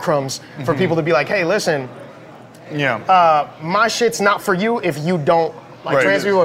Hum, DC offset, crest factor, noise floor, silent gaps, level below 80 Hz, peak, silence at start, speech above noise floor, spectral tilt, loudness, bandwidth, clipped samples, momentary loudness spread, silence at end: none; under 0.1%; 14 dB; -39 dBFS; none; -60 dBFS; -4 dBFS; 0 s; 23 dB; -5 dB/octave; -17 LUFS; 16 kHz; under 0.1%; 10 LU; 0 s